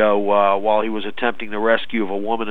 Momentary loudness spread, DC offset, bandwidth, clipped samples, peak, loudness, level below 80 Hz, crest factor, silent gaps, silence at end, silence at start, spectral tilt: 7 LU; 5%; 4.5 kHz; under 0.1%; -2 dBFS; -19 LUFS; -60 dBFS; 16 dB; none; 0 s; 0 s; -7 dB/octave